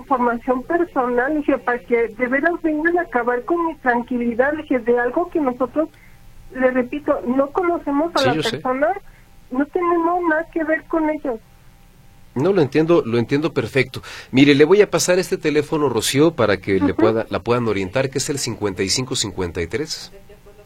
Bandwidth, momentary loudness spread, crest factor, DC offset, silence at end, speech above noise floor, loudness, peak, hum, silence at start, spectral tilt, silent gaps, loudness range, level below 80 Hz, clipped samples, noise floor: 16.5 kHz; 8 LU; 18 dB; under 0.1%; 0.15 s; 28 dB; -19 LUFS; 0 dBFS; none; 0 s; -4.5 dB/octave; none; 5 LU; -46 dBFS; under 0.1%; -47 dBFS